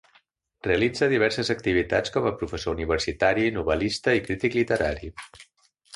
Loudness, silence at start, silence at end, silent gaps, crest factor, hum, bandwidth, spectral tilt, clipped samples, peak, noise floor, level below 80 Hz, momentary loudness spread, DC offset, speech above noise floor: -24 LUFS; 0.65 s; 0.55 s; none; 18 dB; none; 11.5 kHz; -5 dB/octave; under 0.1%; -6 dBFS; -63 dBFS; -44 dBFS; 8 LU; under 0.1%; 39 dB